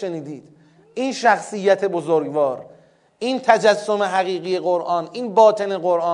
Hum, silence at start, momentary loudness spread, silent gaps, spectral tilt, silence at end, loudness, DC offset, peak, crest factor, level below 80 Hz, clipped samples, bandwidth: none; 0 s; 13 LU; none; -4.5 dB/octave; 0 s; -19 LUFS; under 0.1%; 0 dBFS; 20 dB; -78 dBFS; under 0.1%; 11 kHz